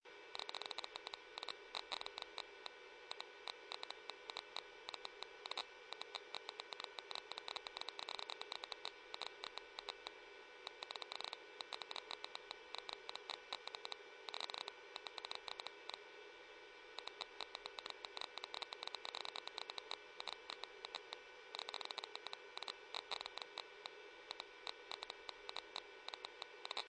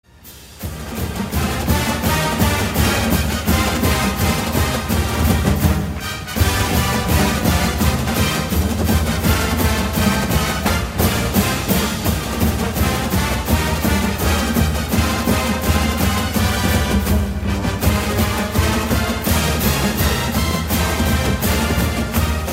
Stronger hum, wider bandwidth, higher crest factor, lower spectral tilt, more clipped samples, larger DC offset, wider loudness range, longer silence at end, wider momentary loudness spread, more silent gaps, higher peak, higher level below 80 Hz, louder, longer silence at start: neither; second, 9.4 kHz vs 16.5 kHz; first, 24 dB vs 16 dB; second, 0 dB/octave vs -4.5 dB/octave; neither; neither; about the same, 2 LU vs 1 LU; about the same, 0 s vs 0 s; about the same, 5 LU vs 3 LU; neither; second, -28 dBFS vs -2 dBFS; second, -86 dBFS vs -24 dBFS; second, -50 LUFS vs -18 LUFS; second, 0.05 s vs 0.25 s